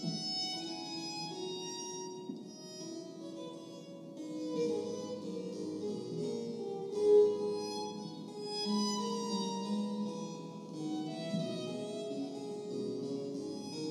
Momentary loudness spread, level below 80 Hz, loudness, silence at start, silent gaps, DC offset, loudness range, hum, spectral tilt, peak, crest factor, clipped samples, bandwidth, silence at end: 12 LU; under -90 dBFS; -37 LUFS; 0 s; none; under 0.1%; 9 LU; none; -5 dB/octave; -18 dBFS; 20 dB; under 0.1%; 12.5 kHz; 0 s